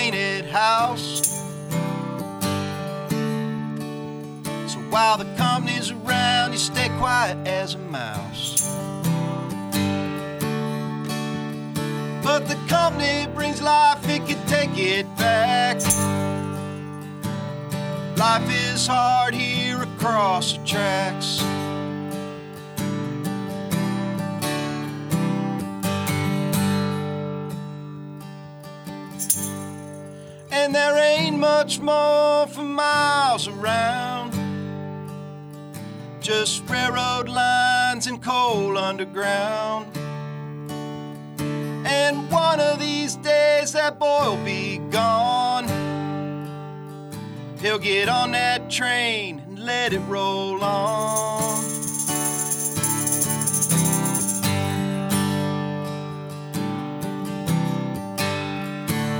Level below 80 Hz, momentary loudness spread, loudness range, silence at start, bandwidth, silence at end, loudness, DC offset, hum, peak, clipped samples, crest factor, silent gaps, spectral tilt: -56 dBFS; 14 LU; 6 LU; 0 s; 19.5 kHz; 0 s; -22 LUFS; under 0.1%; none; 0 dBFS; under 0.1%; 22 dB; none; -3.5 dB/octave